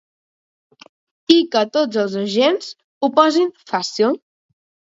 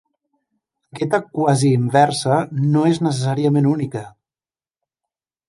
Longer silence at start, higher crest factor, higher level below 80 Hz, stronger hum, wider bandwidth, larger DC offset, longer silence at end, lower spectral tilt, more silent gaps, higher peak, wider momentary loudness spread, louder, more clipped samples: first, 1.3 s vs 0.95 s; about the same, 20 dB vs 18 dB; second, -68 dBFS vs -62 dBFS; neither; second, 7.8 kHz vs 11.5 kHz; neither; second, 0.75 s vs 1.4 s; second, -4.5 dB/octave vs -6.5 dB/octave; first, 2.84-3.01 s vs none; about the same, 0 dBFS vs -2 dBFS; first, 10 LU vs 7 LU; about the same, -18 LUFS vs -18 LUFS; neither